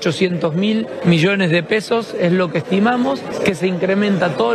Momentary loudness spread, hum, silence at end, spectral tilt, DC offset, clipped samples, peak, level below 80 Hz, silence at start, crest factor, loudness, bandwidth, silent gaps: 4 LU; none; 0 s; -6.5 dB/octave; under 0.1%; under 0.1%; 0 dBFS; -56 dBFS; 0 s; 16 dB; -17 LUFS; 12.5 kHz; none